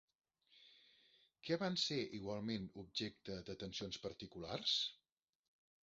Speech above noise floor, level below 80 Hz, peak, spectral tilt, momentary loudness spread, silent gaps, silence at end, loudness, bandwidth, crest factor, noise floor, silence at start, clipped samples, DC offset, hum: 29 dB; -72 dBFS; -24 dBFS; -3 dB/octave; 12 LU; none; 0.9 s; -43 LUFS; 7.6 kHz; 22 dB; -73 dBFS; 0.55 s; under 0.1%; under 0.1%; none